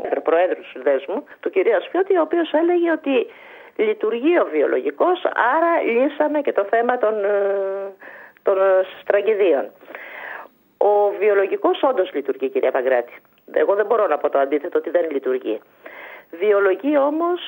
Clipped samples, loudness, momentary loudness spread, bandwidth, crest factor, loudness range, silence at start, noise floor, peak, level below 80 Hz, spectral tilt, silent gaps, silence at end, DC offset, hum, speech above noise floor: under 0.1%; -19 LUFS; 15 LU; 16 kHz; 16 dB; 2 LU; 0 s; -39 dBFS; -2 dBFS; -76 dBFS; -6.5 dB/octave; none; 0 s; under 0.1%; none; 20 dB